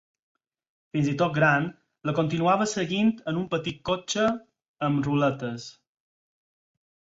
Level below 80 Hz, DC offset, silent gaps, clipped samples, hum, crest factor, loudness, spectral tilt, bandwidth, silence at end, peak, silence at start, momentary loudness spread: -62 dBFS; under 0.1%; 4.68-4.74 s; under 0.1%; none; 20 dB; -26 LUFS; -5.5 dB/octave; 8 kHz; 1.35 s; -8 dBFS; 0.95 s; 12 LU